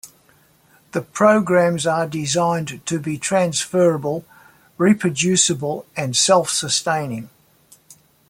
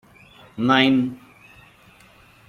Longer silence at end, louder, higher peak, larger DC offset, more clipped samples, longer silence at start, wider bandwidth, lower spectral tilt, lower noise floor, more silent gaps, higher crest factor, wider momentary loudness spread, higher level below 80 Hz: second, 0.35 s vs 1.3 s; about the same, -19 LUFS vs -19 LUFS; about the same, -2 dBFS vs -2 dBFS; neither; neither; second, 0.05 s vs 0.55 s; first, 16.5 kHz vs 6.8 kHz; second, -3.5 dB/octave vs -6 dB/octave; first, -55 dBFS vs -51 dBFS; neither; about the same, 18 dB vs 22 dB; second, 11 LU vs 25 LU; about the same, -60 dBFS vs -62 dBFS